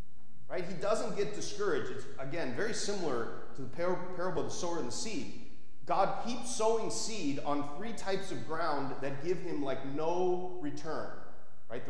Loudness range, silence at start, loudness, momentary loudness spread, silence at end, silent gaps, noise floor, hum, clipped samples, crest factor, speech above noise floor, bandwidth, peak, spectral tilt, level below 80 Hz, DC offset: 2 LU; 0.4 s; -36 LUFS; 10 LU; 0 s; none; -61 dBFS; none; under 0.1%; 20 dB; 26 dB; 11 kHz; -16 dBFS; -4.5 dB/octave; -62 dBFS; 3%